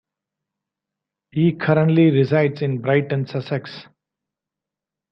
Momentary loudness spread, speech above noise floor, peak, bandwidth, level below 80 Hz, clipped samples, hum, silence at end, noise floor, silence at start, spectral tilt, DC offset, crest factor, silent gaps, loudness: 13 LU; 68 dB; -2 dBFS; 5.8 kHz; -62 dBFS; under 0.1%; none; 1.3 s; -87 dBFS; 1.35 s; -9.5 dB/octave; under 0.1%; 18 dB; none; -19 LUFS